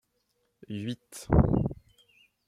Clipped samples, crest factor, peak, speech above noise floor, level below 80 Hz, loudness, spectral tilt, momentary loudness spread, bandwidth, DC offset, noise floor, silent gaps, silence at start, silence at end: under 0.1%; 22 dB; -8 dBFS; 49 dB; -40 dBFS; -28 LUFS; -8 dB/octave; 17 LU; 15 kHz; under 0.1%; -75 dBFS; none; 0.7 s; 0.75 s